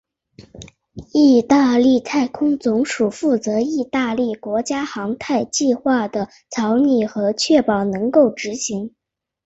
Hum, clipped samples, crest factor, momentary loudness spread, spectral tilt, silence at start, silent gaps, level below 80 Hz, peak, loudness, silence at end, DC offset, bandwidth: none; under 0.1%; 16 dB; 11 LU; -4.5 dB/octave; 0.4 s; none; -56 dBFS; -2 dBFS; -18 LUFS; 0.55 s; under 0.1%; 8.2 kHz